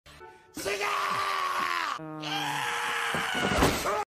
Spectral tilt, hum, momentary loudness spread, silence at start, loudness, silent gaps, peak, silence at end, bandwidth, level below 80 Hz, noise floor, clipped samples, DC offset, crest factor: -3 dB/octave; none; 8 LU; 0.05 s; -29 LUFS; none; -10 dBFS; 0 s; 15.5 kHz; -48 dBFS; -50 dBFS; under 0.1%; under 0.1%; 20 dB